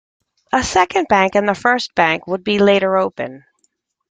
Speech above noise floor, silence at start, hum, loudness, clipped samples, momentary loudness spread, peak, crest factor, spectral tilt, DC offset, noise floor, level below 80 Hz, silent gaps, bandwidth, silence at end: 50 dB; 0.55 s; none; -16 LUFS; under 0.1%; 7 LU; 0 dBFS; 16 dB; -4 dB/octave; under 0.1%; -66 dBFS; -48 dBFS; none; 9.4 kHz; 0.7 s